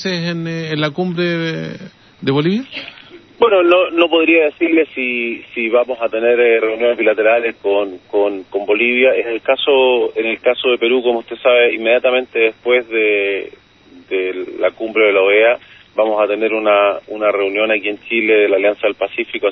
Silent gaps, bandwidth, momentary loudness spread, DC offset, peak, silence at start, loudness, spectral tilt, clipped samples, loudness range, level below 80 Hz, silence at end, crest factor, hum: none; 6.4 kHz; 9 LU; under 0.1%; 0 dBFS; 0 s; -15 LUFS; -6.5 dB/octave; under 0.1%; 2 LU; -60 dBFS; 0 s; 16 dB; none